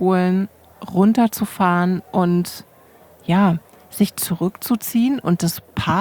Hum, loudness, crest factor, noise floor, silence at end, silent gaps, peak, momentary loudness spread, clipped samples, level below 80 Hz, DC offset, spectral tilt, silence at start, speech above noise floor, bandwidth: none; -19 LUFS; 16 dB; -49 dBFS; 0 s; none; -2 dBFS; 11 LU; under 0.1%; -54 dBFS; under 0.1%; -6 dB/octave; 0 s; 30 dB; over 20 kHz